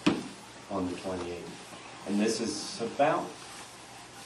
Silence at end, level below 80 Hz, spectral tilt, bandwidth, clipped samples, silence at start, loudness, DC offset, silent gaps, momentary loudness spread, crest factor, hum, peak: 0 s; -66 dBFS; -4.5 dB/octave; 12.5 kHz; under 0.1%; 0 s; -32 LUFS; under 0.1%; none; 17 LU; 22 dB; none; -10 dBFS